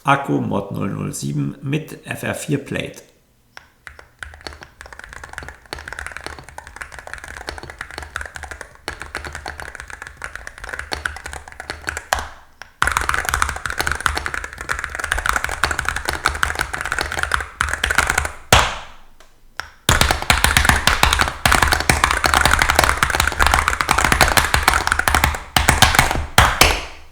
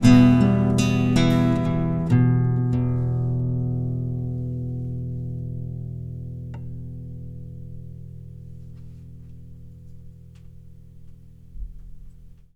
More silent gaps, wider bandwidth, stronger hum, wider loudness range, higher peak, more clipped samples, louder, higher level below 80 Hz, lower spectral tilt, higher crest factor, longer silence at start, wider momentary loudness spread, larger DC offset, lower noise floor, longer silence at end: neither; first, over 20 kHz vs 11 kHz; neither; second, 17 LU vs 24 LU; about the same, 0 dBFS vs -2 dBFS; neither; first, -17 LUFS vs -22 LUFS; first, -30 dBFS vs -42 dBFS; second, -2.5 dB/octave vs -7.5 dB/octave; about the same, 20 dB vs 22 dB; about the same, 0.05 s vs 0 s; second, 20 LU vs 23 LU; neither; first, -47 dBFS vs -43 dBFS; second, 0 s vs 0.2 s